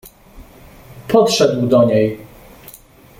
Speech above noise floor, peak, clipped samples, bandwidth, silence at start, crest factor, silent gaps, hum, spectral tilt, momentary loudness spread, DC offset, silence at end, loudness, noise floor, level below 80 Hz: 30 dB; -2 dBFS; under 0.1%; 17 kHz; 0.05 s; 16 dB; none; none; -5.5 dB/octave; 16 LU; under 0.1%; 0.95 s; -14 LUFS; -43 dBFS; -46 dBFS